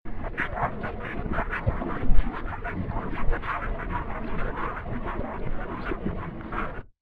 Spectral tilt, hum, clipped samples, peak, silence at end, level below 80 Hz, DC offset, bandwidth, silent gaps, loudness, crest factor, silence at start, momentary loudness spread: -9 dB/octave; none; under 0.1%; -4 dBFS; 0 s; -30 dBFS; under 0.1%; 4.2 kHz; none; -32 LUFS; 20 dB; 0.05 s; 5 LU